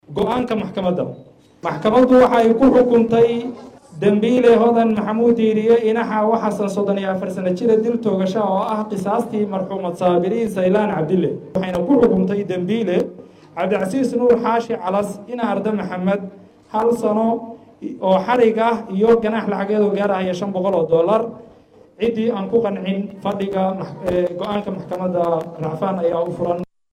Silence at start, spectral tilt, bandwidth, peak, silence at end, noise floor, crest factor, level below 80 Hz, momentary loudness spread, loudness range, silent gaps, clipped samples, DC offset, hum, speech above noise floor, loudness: 0.1 s; -7.5 dB/octave; 12.5 kHz; -4 dBFS; 0.3 s; -48 dBFS; 14 dB; -52 dBFS; 11 LU; 6 LU; none; under 0.1%; under 0.1%; none; 30 dB; -18 LUFS